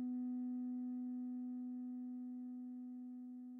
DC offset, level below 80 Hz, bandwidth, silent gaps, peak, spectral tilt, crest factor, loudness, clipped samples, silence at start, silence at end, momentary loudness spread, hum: under 0.1%; under -90 dBFS; 1.8 kHz; none; -38 dBFS; -8 dB/octave; 8 dB; -46 LUFS; under 0.1%; 0 s; 0 s; 7 LU; none